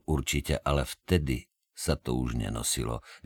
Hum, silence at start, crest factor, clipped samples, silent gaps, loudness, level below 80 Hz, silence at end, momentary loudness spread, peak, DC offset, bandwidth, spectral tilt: none; 0.1 s; 18 dB; under 0.1%; none; -30 LUFS; -38 dBFS; 0.1 s; 7 LU; -12 dBFS; under 0.1%; 19 kHz; -4.5 dB/octave